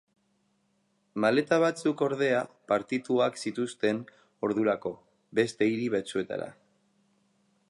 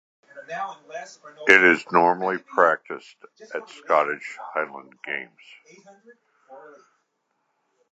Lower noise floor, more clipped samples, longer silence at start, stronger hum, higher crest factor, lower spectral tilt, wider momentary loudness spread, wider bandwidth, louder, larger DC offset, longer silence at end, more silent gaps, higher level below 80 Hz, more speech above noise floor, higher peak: about the same, -72 dBFS vs -74 dBFS; neither; first, 1.15 s vs 0.35 s; neither; second, 18 dB vs 24 dB; about the same, -5.5 dB/octave vs -4.5 dB/octave; second, 10 LU vs 22 LU; first, 11.5 kHz vs 8.6 kHz; second, -29 LUFS vs -21 LUFS; neither; second, 1.2 s vs 1.35 s; neither; about the same, -74 dBFS vs -74 dBFS; second, 44 dB vs 50 dB; second, -10 dBFS vs 0 dBFS